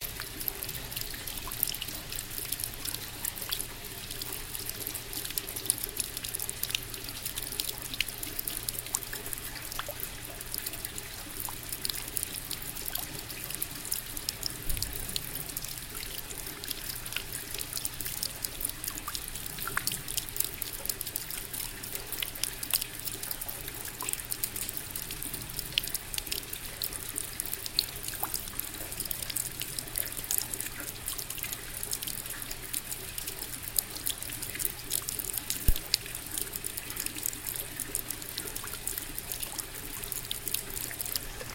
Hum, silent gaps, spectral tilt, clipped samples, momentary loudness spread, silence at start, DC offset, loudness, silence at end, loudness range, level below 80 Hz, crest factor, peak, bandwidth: none; none; -1 dB/octave; under 0.1%; 6 LU; 0 s; under 0.1%; -34 LUFS; 0 s; 3 LU; -46 dBFS; 34 dB; -2 dBFS; 17 kHz